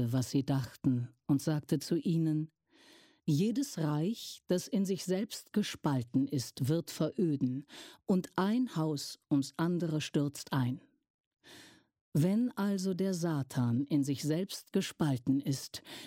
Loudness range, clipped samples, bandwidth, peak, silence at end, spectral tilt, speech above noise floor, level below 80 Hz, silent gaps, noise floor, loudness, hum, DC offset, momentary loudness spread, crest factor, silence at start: 2 LU; under 0.1%; 16.5 kHz; -18 dBFS; 0 s; -6.5 dB/octave; 29 dB; -70 dBFS; 11.10-11.31 s, 12.01-12.12 s; -62 dBFS; -33 LUFS; none; under 0.1%; 5 LU; 16 dB; 0 s